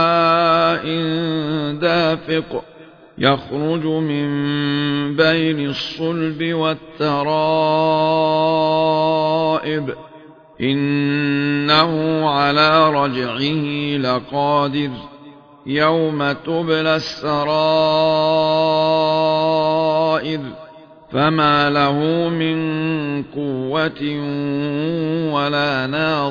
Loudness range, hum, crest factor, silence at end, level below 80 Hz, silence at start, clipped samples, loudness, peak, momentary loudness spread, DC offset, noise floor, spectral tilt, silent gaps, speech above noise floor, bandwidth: 4 LU; none; 18 dB; 0 s; -54 dBFS; 0 s; under 0.1%; -18 LUFS; 0 dBFS; 8 LU; under 0.1%; -43 dBFS; -7 dB/octave; none; 25 dB; 5.4 kHz